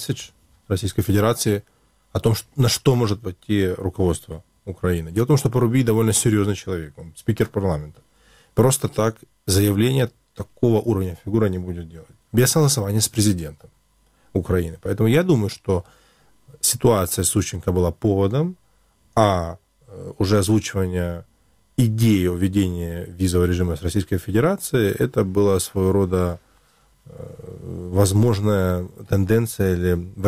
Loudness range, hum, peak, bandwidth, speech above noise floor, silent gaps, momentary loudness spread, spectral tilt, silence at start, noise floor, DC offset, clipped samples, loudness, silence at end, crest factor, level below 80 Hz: 2 LU; none; -2 dBFS; 16.5 kHz; 40 dB; none; 12 LU; -5.5 dB/octave; 0 s; -60 dBFS; 0.1%; under 0.1%; -21 LUFS; 0 s; 20 dB; -42 dBFS